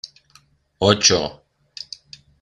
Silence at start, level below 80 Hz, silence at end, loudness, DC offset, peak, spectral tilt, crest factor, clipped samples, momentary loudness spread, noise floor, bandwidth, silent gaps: 0.05 s; -54 dBFS; 1.1 s; -17 LUFS; under 0.1%; 0 dBFS; -2.5 dB/octave; 22 dB; under 0.1%; 23 LU; -56 dBFS; 12 kHz; none